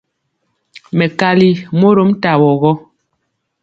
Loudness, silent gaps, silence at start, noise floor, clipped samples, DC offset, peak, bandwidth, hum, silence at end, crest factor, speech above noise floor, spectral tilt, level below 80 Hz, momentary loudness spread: -12 LUFS; none; 0.95 s; -69 dBFS; under 0.1%; under 0.1%; 0 dBFS; 7.4 kHz; none; 0.85 s; 14 dB; 58 dB; -8 dB/octave; -54 dBFS; 6 LU